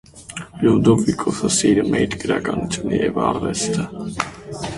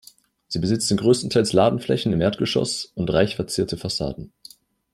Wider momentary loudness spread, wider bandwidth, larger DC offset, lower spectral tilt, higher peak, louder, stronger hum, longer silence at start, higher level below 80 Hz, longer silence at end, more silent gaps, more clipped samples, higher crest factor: first, 12 LU vs 8 LU; second, 11.5 kHz vs 15 kHz; neither; about the same, -5 dB/octave vs -5 dB/octave; about the same, 0 dBFS vs -2 dBFS; first, -19 LUFS vs -22 LUFS; neither; second, 0.15 s vs 0.5 s; about the same, -44 dBFS vs -48 dBFS; second, 0 s vs 0.65 s; neither; neither; about the same, 18 dB vs 20 dB